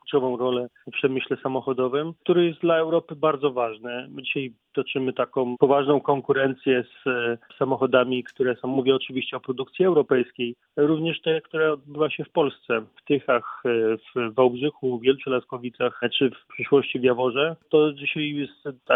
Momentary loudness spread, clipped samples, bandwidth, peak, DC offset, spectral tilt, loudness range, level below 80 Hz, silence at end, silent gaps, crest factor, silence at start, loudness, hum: 8 LU; under 0.1%; 4 kHz; -4 dBFS; under 0.1%; -8.5 dB/octave; 2 LU; -70 dBFS; 0 s; none; 20 dB; 0.05 s; -24 LUFS; none